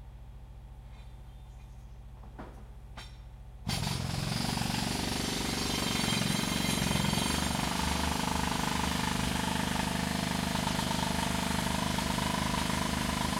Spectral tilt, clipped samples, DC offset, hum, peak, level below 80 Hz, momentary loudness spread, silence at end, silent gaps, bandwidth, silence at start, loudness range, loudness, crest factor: -3.5 dB/octave; under 0.1%; under 0.1%; none; -16 dBFS; -44 dBFS; 21 LU; 0 s; none; 16.5 kHz; 0 s; 11 LU; -31 LUFS; 18 dB